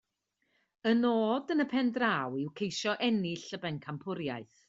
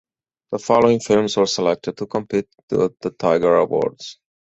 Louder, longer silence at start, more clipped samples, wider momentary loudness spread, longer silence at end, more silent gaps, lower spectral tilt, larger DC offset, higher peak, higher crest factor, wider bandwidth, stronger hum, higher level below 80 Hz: second, -32 LUFS vs -19 LUFS; first, 0.85 s vs 0.5 s; neither; about the same, 10 LU vs 11 LU; about the same, 0.25 s vs 0.3 s; second, none vs 2.63-2.68 s; about the same, -5 dB/octave vs -5 dB/octave; neither; second, -14 dBFS vs 0 dBFS; about the same, 18 dB vs 18 dB; about the same, 7.8 kHz vs 8.2 kHz; neither; second, -74 dBFS vs -56 dBFS